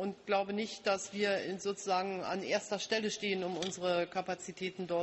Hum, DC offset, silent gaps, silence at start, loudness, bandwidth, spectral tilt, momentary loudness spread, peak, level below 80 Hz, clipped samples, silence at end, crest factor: none; under 0.1%; none; 0 s; -35 LUFS; 8.4 kHz; -3.5 dB/octave; 5 LU; -20 dBFS; -76 dBFS; under 0.1%; 0 s; 16 dB